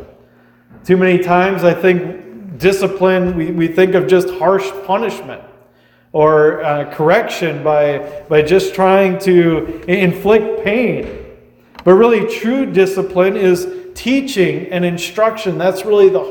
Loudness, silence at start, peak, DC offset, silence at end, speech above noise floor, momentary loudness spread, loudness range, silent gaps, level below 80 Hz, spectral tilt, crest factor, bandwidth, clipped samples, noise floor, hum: -14 LUFS; 0 s; 0 dBFS; under 0.1%; 0 s; 37 dB; 9 LU; 2 LU; none; -46 dBFS; -6.5 dB/octave; 14 dB; 19.5 kHz; under 0.1%; -50 dBFS; none